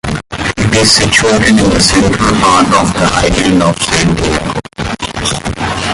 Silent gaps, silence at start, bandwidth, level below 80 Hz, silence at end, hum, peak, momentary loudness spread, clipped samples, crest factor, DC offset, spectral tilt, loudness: none; 0.05 s; 16 kHz; -26 dBFS; 0 s; none; 0 dBFS; 11 LU; under 0.1%; 10 dB; under 0.1%; -4 dB/octave; -10 LUFS